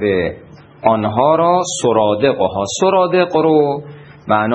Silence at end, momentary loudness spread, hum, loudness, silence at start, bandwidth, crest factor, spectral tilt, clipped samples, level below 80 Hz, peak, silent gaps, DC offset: 0 s; 6 LU; none; -15 LUFS; 0 s; 10 kHz; 14 dB; -5 dB/octave; under 0.1%; -52 dBFS; 0 dBFS; none; under 0.1%